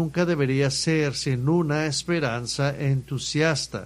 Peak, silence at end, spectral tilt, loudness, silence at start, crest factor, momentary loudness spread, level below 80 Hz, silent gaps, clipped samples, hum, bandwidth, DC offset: -8 dBFS; 0 s; -5 dB/octave; -24 LUFS; 0 s; 16 dB; 4 LU; -52 dBFS; none; under 0.1%; none; 12.5 kHz; under 0.1%